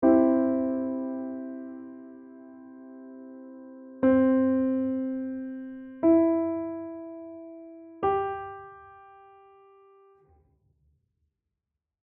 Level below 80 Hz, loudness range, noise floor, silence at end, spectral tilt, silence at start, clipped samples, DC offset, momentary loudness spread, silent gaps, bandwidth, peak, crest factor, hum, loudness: -62 dBFS; 10 LU; -86 dBFS; 3.05 s; -7.5 dB/octave; 0 s; under 0.1%; under 0.1%; 25 LU; none; 3.4 kHz; -10 dBFS; 20 dB; none; -26 LUFS